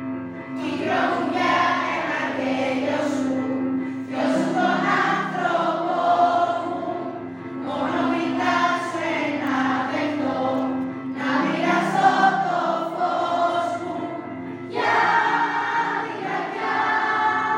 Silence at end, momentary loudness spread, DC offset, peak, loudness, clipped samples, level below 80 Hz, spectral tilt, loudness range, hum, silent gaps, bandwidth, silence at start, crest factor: 0 s; 10 LU; under 0.1%; -4 dBFS; -22 LUFS; under 0.1%; -72 dBFS; -5 dB/octave; 2 LU; none; none; 15.5 kHz; 0 s; 18 dB